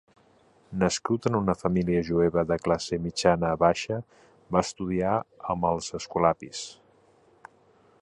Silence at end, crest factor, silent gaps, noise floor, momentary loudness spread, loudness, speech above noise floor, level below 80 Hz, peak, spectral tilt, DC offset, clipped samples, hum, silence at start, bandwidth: 1.3 s; 22 dB; none; -61 dBFS; 9 LU; -27 LUFS; 35 dB; -50 dBFS; -6 dBFS; -5.5 dB/octave; under 0.1%; under 0.1%; none; 0.7 s; 11 kHz